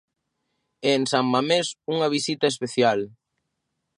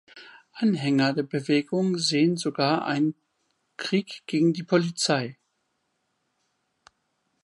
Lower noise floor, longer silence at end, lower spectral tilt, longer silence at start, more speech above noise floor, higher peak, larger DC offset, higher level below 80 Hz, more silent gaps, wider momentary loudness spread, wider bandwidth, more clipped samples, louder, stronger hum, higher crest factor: first, -79 dBFS vs -75 dBFS; second, 0.9 s vs 2.1 s; about the same, -4 dB/octave vs -5 dB/octave; first, 0.8 s vs 0.15 s; first, 56 dB vs 51 dB; about the same, -6 dBFS vs -8 dBFS; neither; first, -72 dBFS vs -78 dBFS; neither; about the same, 6 LU vs 6 LU; about the same, 11.5 kHz vs 11.5 kHz; neither; about the same, -23 LUFS vs -25 LUFS; neither; about the same, 18 dB vs 18 dB